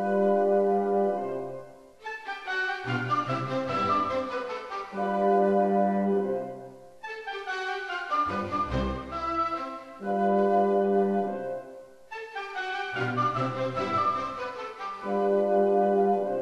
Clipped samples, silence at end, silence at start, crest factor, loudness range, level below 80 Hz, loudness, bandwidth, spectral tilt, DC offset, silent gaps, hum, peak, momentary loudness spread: under 0.1%; 0 s; 0 s; 14 dB; 4 LU; -52 dBFS; -27 LUFS; 9 kHz; -7 dB/octave; under 0.1%; none; none; -12 dBFS; 14 LU